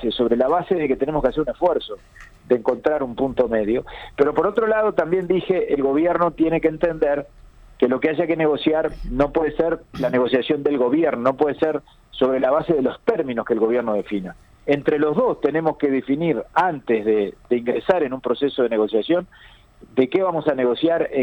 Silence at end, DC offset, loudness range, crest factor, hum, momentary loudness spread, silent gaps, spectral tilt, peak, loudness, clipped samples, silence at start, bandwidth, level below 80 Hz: 0 s; under 0.1%; 2 LU; 16 dB; none; 5 LU; none; -8 dB/octave; -4 dBFS; -21 LUFS; under 0.1%; 0 s; 6.4 kHz; -44 dBFS